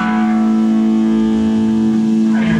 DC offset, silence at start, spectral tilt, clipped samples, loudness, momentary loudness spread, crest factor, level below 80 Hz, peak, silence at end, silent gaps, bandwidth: under 0.1%; 0 s; -7.5 dB/octave; under 0.1%; -14 LUFS; 1 LU; 10 dB; -44 dBFS; -4 dBFS; 0 s; none; 8 kHz